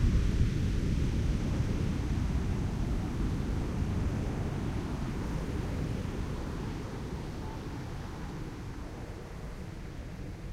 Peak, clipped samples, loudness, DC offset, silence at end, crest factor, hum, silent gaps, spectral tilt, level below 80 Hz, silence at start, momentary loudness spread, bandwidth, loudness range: -16 dBFS; under 0.1%; -35 LUFS; under 0.1%; 0 s; 18 dB; none; none; -7 dB/octave; -36 dBFS; 0 s; 11 LU; 14.5 kHz; 9 LU